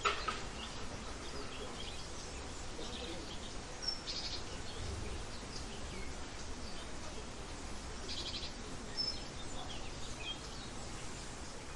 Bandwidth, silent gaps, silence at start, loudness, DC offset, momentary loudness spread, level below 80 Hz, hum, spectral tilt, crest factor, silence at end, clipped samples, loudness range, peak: 11.5 kHz; none; 0 s; -43 LUFS; under 0.1%; 7 LU; -50 dBFS; none; -3 dB/octave; 24 dB; 0 s; under 0.1%; 3 LU; -20 dBFS